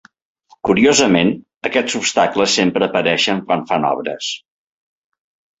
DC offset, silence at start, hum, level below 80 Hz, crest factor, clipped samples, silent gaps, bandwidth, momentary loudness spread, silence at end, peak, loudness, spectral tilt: under 0.1%; 0.65 s; none; -54 dBFS; 18 dB; under 0.1%; 1.56-1.61 s; 8.2 kHz; 12 LU; 1.25 s; 0 dBFS; -16 LUFS; -3.5 dB/octave